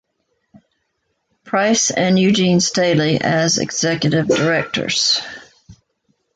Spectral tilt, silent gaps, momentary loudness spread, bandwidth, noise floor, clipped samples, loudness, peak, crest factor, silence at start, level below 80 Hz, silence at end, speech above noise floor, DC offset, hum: -4 dB/octave; none; 5 LU; 9.4 kHz; -70 dBFS; under 0.1%; -16 LUFS; -2 dBFS; 16 dB; 1.45 s; -54 dBFS; 0.65 s; 54 dB; under 0.1%; none